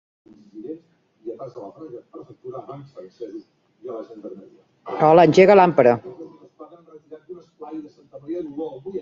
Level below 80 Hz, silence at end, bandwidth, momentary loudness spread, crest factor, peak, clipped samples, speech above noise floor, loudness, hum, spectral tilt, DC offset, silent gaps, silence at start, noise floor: -64 dBFS; 0 s; 7.6 kHz; 28 LU; 20 dB; -2 dBFS; under 0.1%; 24 dB; -16 LUFS; none; -7 dB/octave; under 0.1%; none; 0.55 s; -45 dBFS